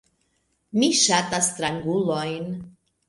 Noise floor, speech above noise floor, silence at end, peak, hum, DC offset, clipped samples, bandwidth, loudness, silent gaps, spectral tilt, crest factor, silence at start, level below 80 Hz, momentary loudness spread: -70 dBFS; 47 dB; 0.4 s; -4 dBFS; none; under 0.1%; under 0.1%; 11.5 kHz; -22 LUFS; none; -3 dB/octave; 20 dB; 0.75 s; -60 dBFS; 13 LU